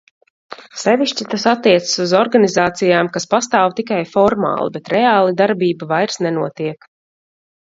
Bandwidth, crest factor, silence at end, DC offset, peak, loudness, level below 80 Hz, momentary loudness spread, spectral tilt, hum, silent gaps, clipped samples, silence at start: 7.8 kHz; 16 dB; 0.9 s; under 0.1%; 0 dBFS; -16 LUFS; -58 dBFS; 8 LU; -4.5 dB/octave; none; none; under 0.1%; 0.5 s